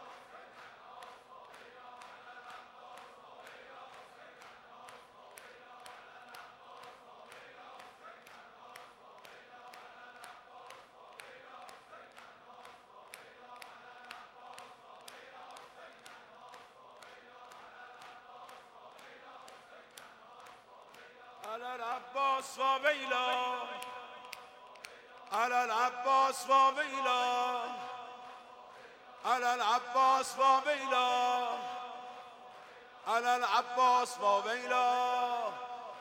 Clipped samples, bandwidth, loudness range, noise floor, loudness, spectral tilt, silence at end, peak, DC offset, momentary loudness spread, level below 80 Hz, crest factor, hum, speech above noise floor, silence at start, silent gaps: under 0.1%; 16 kHz; 22 LU; -56 dBFS; -32 LUFS; -1 dB/octave; 0 s; -16 dBFS; under 0.1%; 24 LU; -86 dBFS; 22 dB; none; 25 dB; 0 s; none